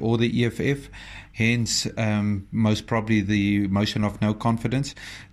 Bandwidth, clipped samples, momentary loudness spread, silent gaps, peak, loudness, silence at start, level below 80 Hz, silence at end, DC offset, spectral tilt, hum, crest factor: 13 kHz; under 0.1%; 9 LU; none; -8 dBFS; -24 LUFS; 0 s; -48 dBFS; 0.05 s; under 0.1%; -5.5 dB/octave; none; 16 dB